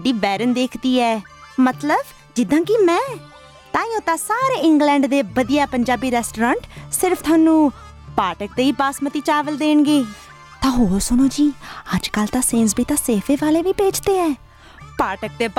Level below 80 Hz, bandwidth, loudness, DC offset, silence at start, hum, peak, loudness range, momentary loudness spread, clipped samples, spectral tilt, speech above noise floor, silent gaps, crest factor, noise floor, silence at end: -40 dBFS; 17 kHz; -18 LUFS; under 0.1%; 0 s; none; -6 dBFS; 2 LU; 9 LU; under 0.1%; -4 dB/octave; 24 dB; none; 14 dB; -41 dBFS; 0.05 s